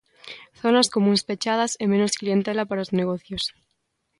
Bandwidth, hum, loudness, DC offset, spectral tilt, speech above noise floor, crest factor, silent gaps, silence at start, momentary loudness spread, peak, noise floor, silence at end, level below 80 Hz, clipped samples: 11.5 kHz; none; -23 LUFS; under 0.1%; -4.5 dB/octave; 52 dB; 18 dB; none; 0.25 s; 10 LU; -6 dBFS; -74 dBFS; 0.7 s; -60 dBFS; under 0.1%